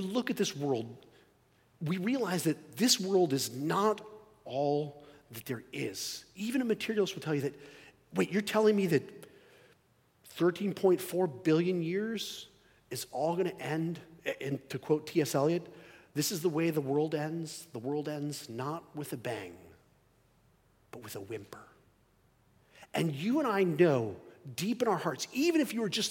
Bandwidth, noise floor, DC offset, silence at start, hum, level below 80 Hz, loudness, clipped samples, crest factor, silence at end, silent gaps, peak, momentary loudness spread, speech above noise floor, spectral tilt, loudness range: 17 kHz; -69 dBFS; under 0.1%; 0 s; none; -76 dBFS; -32 LUFS; under 0.1%; 20 dB; 0 s; none; -12 dBFS; 16 LU; 37 dB; -5 dB/octave; 10 LU